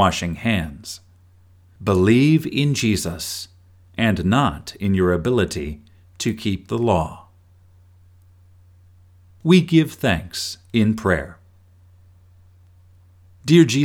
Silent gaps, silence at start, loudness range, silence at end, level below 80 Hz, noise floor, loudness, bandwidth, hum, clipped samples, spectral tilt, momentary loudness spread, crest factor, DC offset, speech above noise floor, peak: none; 0 s; 7 LU; 0 s; -44 dBFS; -51 dBFS; -20 LUFS; 17.5 kHz; none; under 0.1%; -5.5 dB/octave; 16 LU; 20 dB; under 0.1%; 33 dB; -2 dBFS